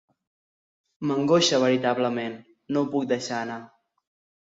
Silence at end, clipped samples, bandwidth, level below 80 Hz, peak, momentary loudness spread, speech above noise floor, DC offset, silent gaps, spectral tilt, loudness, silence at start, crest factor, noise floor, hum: 0.75 s; under 0.1%; 7.8 kHz; -72 dBFS; -8 dBFS; 15 LU; over 66 dB; under 0.1%; none; -4.5 dB/octave; -24 LUFS; 1 s; 18 dB; under -90 dBFS; none